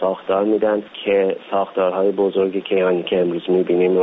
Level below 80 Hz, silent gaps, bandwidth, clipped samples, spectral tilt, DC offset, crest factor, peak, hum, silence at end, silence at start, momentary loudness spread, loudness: -62 dBFS; none; 4 kHz; under 0.1%; -4.5 dB/octave; under 0.1%; 12 dB; -6 dBFS; none; 0 s; 0 s; 3 LU; -19 LUFS